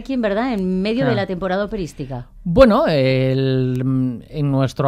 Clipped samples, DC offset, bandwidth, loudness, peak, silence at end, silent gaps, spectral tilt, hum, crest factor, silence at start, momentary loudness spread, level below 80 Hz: under 0.1%; under 0.1%; 10.5 kHz; -18 LUFS; 0 dBFS; 0 s; none; -8 dB/octave; none; 18 dB; 0 s; 13 LU; -36 dBFS